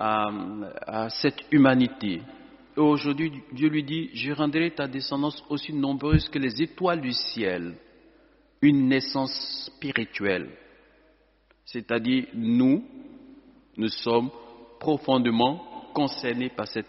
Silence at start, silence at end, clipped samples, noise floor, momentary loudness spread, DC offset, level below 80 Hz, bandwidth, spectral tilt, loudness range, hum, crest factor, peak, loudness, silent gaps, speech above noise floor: 0 s; 0.05 s; under 0.1%; -63 dBFS; 13 LU; under 0.1%; -48 dBFS; 6 kHz; -4.5 dB/octave; 4 LU; none; 20 dB; -6 dBFS; -26 LUFS; none; 38 dB